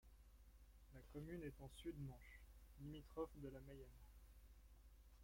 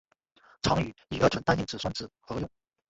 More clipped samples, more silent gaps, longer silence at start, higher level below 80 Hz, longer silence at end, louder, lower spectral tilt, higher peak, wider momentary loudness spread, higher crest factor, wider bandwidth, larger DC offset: neither; neither; second, 0 s vs 0.65 s; second, -64 dBFS vs -50 dBFS; second, 0 s vs 0.45 s; second, -57 LUFS vs -30 LUFS; first, -7 dB/octave vs -5.5 dB/octave; second, -36 dBFS vs -10 dBFS; first, 15 LU vs 12 LU; about the same, 20 dB vs 22 dB; first, 16.5 kHz vs 8.2 kHz; neither